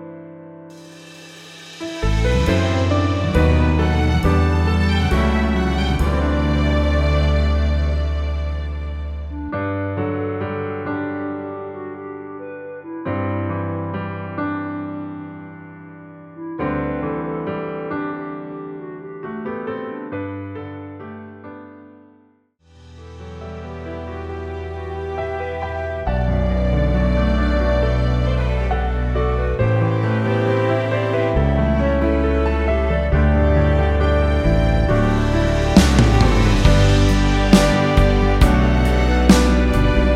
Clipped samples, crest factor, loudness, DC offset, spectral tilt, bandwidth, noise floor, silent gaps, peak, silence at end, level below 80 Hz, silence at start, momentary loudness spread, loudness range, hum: under 0.1%; 18 dB; -19 LUFS; under 0.1%; -6.5 dB/octave; 13 kHz; -56 dBFS; none; 0 dBFS; 0 s; -22 dBFS; 0 s; 18 LU; 15 LU; none